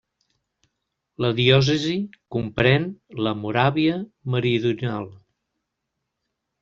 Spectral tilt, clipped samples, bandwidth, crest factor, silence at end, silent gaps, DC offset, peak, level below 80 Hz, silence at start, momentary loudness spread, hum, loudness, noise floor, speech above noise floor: -6.5 dB/octave; under 0.1%; 7.2 kHz; 20 dB; 1.45 s; none; under 0.1%; -4 dBFS; -54 dBFS; 1.2 s; 12 LU; none; -22 LUFS; -80 dBFS; 58 dB